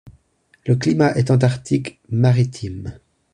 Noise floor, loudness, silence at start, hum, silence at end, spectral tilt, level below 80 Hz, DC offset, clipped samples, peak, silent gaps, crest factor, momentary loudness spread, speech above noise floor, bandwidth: -59 dBFS; -18 LUFS; 0.05 s; none; 0.4 s; -7.5 dB/octave; -48 dBFS; under 0.1%; under 0.1%; -2 dBFS; none; 16 dB; 15 LU; 41 dB; 10 kHz